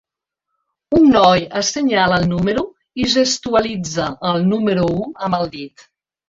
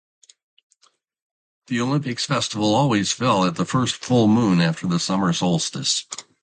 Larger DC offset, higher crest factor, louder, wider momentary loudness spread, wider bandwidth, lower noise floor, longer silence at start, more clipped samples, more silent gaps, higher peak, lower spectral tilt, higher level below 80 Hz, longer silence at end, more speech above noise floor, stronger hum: neither; about the same, 16 dB vs 16 dB; first, -16 LUFS vs -20 LUFS; first, 10 LU vs 6 LU; second, 7.8 kHz vs 9.4 kHz; first, -80 dBFS vs -63 dBFS; second, 0.9 s vs 1.7 s; neither; neither; first, -2 dBFS vs -6 dBFS; about the same, -4.5 dB/octave vs -4.5 dB/octave; first, -44 dBFS vs -58 dBFS; first, 0.6 s vs 0.2 s; first, 64 dB vs 43 dB; neither